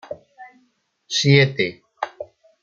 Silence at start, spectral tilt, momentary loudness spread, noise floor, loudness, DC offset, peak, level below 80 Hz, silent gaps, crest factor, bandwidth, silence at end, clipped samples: 0.1 s; -5 dB/octave; 23 LU; -65 dBFS; -19 LUFS; under 0.1%; 0 dBFS; -60 dBFS; none; 22 dB; 7.6 kHz; 0.4 s; under 0.1%